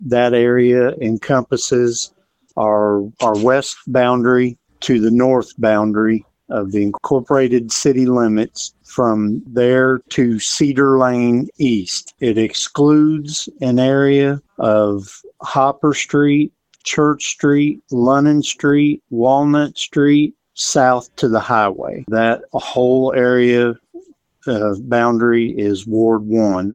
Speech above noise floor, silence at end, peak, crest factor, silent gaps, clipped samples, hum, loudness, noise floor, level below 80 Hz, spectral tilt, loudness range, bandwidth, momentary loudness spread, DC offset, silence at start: 26 dB; 0 s; 0 dBFS; 14 dB; none; under 0.1%; none; -15 LUFS; -41 dBFS; -54 dBFS; -5 dB/octave; 2 LU; 9.6 kHz; 8 LU; under 0.1%; 0 s